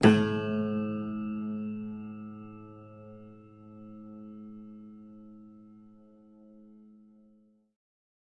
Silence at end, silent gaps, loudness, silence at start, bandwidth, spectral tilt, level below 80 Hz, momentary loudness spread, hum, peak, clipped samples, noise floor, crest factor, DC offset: 2.4 s; none; -32 LUFS; 0 s; 9.6 kHz; -7 dB/octave; -66 dBFS; 24 LU; none; -6 dBFS; under 0.1%; -64 dBFS; 28 dB; under 0.1%